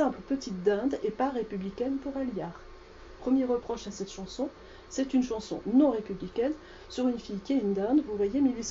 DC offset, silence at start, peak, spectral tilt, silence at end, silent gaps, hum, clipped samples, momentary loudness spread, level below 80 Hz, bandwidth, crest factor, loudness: under 0.1%; 0 s; -12 dBFS; -6 dB/octave; 0 s; none; none; under 0.1%; 11 LU; -54 dBFS; 7.6 kHz; 18 dB; -30 LUFS